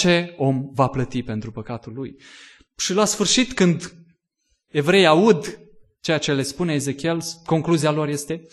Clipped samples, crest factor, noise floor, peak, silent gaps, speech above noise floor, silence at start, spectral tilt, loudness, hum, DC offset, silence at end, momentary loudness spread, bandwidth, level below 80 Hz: under 0.1%; 20 dB; -71 dBFS; -2 dBFS; none; 51 dB; 0 s; -4.5 dB/octave; -20 LUFS; none; under 0.1%; 0.1 s; 16 LU; 12.5 kHz; -52 dBFS